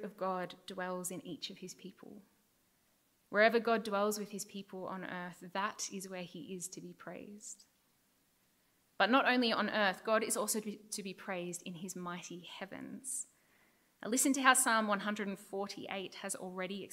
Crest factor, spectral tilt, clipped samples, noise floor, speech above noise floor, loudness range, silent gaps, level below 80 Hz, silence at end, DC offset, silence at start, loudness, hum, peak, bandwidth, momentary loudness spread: 28 dB; -2.5 dB/octave; under 0.1%; -74 dBFS; 38 dB; 10 LU; none; -86 dBFS; 0.05 s; under 0.1%; 0 s; -35 LUFS; none; -10 dBFS; 16 kHz; 20 LU